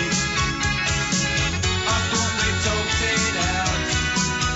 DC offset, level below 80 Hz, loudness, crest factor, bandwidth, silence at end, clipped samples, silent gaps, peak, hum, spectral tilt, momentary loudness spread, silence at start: under 0.1%; -34 dBFS; -21 LUFS; 12 dB; 8.2 kHz; 0 s; under 0.1%; none; -10 dBFS; none; -3 dB/octave; 2 LU; 0 s